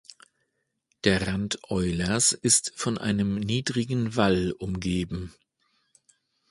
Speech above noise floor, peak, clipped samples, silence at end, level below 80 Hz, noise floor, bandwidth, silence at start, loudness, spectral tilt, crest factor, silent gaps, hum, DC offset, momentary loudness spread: 51 dB; -4 dBFS; under 0.1%; 1.2 s; -48 dBFS; -77 dBFS; 11.5 kHz; 1.05 s; -25 LUFS; -4 dB/octave; 22 dB; none; none; under 0.1%; 9 LU